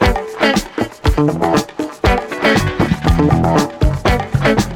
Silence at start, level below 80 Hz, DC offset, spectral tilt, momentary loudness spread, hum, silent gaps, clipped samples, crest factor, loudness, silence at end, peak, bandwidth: 0 s; -22 dBFS; under 0.1%; -6 dB/octave; 5 LU; none; none; under 0.1%; 14 dB; -15 LUFS; 0 s; -2 dBFS; 18 kHz